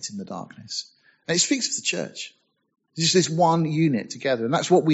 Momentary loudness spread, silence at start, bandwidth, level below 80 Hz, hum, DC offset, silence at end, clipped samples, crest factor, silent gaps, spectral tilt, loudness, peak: 17 LU; 0 s; 8.2 kHz; -68 dBFS; none; under 0.1%; 0 s; under 0.1%; 18 dB; none; -4 dB/octave; -23 LUFS; -6 dBFS